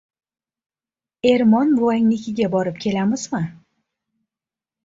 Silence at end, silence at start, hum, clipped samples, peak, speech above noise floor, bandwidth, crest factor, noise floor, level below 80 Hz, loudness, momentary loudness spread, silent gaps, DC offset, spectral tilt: 1.3 s; 1.25 s; none; under 0.1%; -4 dBFS; over 72 dB; 7.8 kHz; 18 dB; under -90 dBFS; -60 dBFS; -19 LUFS; 10 LU; none; under 0.1%; -6 dB/octave